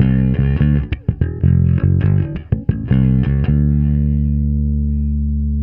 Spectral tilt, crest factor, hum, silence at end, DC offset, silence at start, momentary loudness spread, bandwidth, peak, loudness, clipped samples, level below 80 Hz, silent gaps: -12.5 dB/octave; 14 dB; none; 0 s; under 0.1%; 0 s; 6 LU; 3.5 kHz; 0 dBFS; -16 LUFS; under 0.1%; -20 dBFS; none